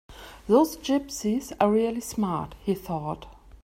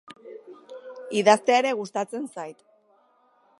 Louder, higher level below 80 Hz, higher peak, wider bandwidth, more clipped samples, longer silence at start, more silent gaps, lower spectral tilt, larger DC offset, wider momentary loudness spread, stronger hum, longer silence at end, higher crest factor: second, -26 LUFS vs -23 LUFS; first, -52 dBFS vs -82 dBFS; second, -8 dBFS vs -4 dBFS; first, 16 kHz vs 11.5 kHz; neither; about the same, 0.1 s vs 0.1 s; neither; first, -5.5 dB/octave vs -3.5 dB/octave; neither; second, 13 LU vs 25 LU; neither; second, 0.15 s vs 1.05 s; about the same, 20 dB vs 24 dB